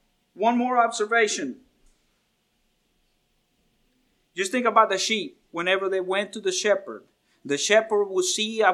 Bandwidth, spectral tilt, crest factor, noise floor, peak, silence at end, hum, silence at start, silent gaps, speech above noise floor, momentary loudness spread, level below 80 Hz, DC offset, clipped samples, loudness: 14 kHz; -2 dB/octave; 22 dB; -70 dBFS; -4 dBFS; 0 s; none; 0.35 s; none; 47 dB; 12 LU; -74 dBFS; under 0.1%; under 0.1%; -23 LUFS